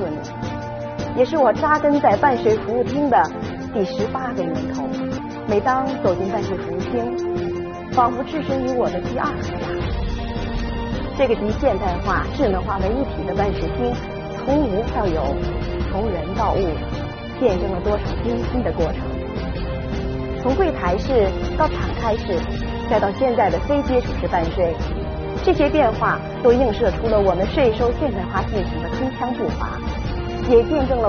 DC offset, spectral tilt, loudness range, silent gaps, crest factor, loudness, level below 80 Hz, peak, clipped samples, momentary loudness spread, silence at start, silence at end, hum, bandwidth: under 0.1%; -5.5 dB/octave; 4 LU; none; 16 dB; -21 LUFS; -30 dBFS; -4 dBFS; under 0.1%; 9 LU; 0 s; 0 s; none; 6.6 kHz